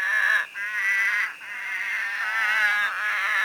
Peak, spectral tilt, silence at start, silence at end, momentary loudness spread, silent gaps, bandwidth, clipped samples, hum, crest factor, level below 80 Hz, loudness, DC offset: -10 dBFS; 2 dB/octave; 0 s; 0 s; 8 LU; none; 19.5 kHz; under 0.1%; none; 16 dB; -74 dBFS; -23 LUFS; under 0.1%